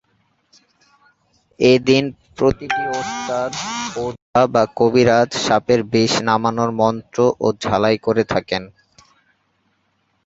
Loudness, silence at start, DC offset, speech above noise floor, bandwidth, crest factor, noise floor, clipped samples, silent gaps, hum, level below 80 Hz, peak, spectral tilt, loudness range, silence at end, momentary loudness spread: -18 LUFS; 1.6 s; under 0.1%; 49 dB; 8 kHz; 18 dB; -66 dBFS; under 0.1%; 4.22-4.33 s; none; -50 dBFS; 0 dBFS; -5 dB/octave; 3 LU; 1.55 s; 9 LU